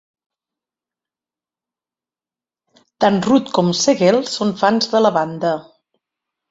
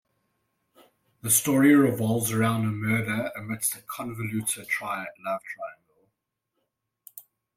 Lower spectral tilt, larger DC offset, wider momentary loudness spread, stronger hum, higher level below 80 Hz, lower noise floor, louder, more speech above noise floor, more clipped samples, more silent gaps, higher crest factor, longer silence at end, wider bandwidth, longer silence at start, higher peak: about the same, -4.5 dB/octave vs -4.5 dB/octave; neither; second, 7 LU vs 19 LU; neither; first, -60 dBFS vs -66 dBFS; first, under -90 dBFS vs -81 dBFS; first, -16 LUFS vs -25 LUFS; first, over 74 dB vs 55 dB; neither; neither; about the same, 18 dB vs 20 dB; first, 0.9 s vs 0.35 s; second, 8 kHz vs 16.5 kHz; first, 3 s vs 1.25 s; first, -2 dBFS vs -8 dBFS